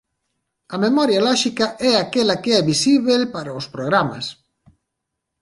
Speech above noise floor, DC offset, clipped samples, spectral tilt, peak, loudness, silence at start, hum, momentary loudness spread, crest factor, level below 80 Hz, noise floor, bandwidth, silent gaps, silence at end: 61 dB; under 0.1%; under 0.1%; -4 dB/octave; -2 dBFS; -18 LUFS; 0.7 s; none; 12 LU; 18 dB; -60 dBFS; -79 dBFS; 11.5 kHz; none; 1.1 s